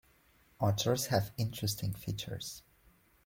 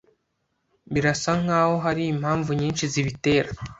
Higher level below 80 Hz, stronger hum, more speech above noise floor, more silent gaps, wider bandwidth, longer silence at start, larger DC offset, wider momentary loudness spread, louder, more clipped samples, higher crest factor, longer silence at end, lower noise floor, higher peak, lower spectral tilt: second, -60 dBFS vs -50 dBFS; neither; second, 33 dB vs 51 dB; neither; first, 16.5 kHz vs 8 kHz; second, 0.6 s vs 0.9 s; neither; first, 11 LU vs 4 LU; second, -35 LUFS vs -23 LUFS; neither; about the same, 18 dB vs 18 dB; first, 0.65 s vs 0.05 s; second, -67 dBFS vs -74 dBFS; second, -18 dBFS vs -6 dBFS; about the same, -4.5 dB/octave vs -5.5 dB/octave